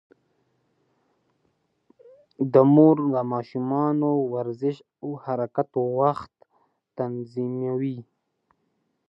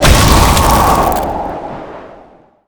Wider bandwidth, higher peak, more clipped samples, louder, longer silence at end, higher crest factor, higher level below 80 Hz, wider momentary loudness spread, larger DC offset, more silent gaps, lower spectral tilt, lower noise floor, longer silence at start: second, 5.6 kHz vs over 20 kHz; second, -4 dBFS vs 0 dBFS; second, under 0.1% vs 0.9%; second, -23 LUFS vs -10 LUFS; first, 1.05 s vs 0.6 s; first, 22 dB vs 12 dB; second, -72 dBFS vs -16 dBFS; second, 17 LU vs 20 LU; neither; neither; first, -11 dB/octave vs -4 dB/octave; first, -73 dBFS vs -42 dBFS; first, 2.4 s vs 0 s